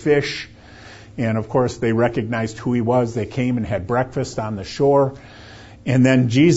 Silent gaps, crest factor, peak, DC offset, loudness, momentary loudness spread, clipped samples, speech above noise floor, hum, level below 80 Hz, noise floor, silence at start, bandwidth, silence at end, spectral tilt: none; 18 dB; -2 dBFS; under 0.1%; -20 LUFS; 17 LU; under 0.1%; 23 dB; none; -48 dBFS; -41 dBFS; 0 s; 8 kHz; 0 s; -7 dB/octave